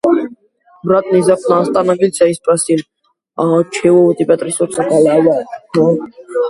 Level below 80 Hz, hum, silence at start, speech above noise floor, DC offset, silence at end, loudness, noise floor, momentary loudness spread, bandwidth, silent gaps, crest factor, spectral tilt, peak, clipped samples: -56 dBFS; none; 0.05 s; 35 dB; under 0.1%; 0 s; -13 LUFS; -48 dBFS; 9 LU; 11.5 kHz; none; 12 dB; -6 dB/octave; 0 dBFS; under 0.1%